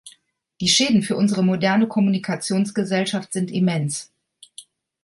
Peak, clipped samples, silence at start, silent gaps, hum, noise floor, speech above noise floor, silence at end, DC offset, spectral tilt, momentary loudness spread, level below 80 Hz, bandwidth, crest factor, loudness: -6 dBFS; under 0.1%; 0.05 s; none; none; -58 dBFS; 38 dB; 0.4 s; under 0.1%; -4.5 dB/octave; 8 LU; -62 dBFS; 11.5 kHz; 16 dB; -20 LUFS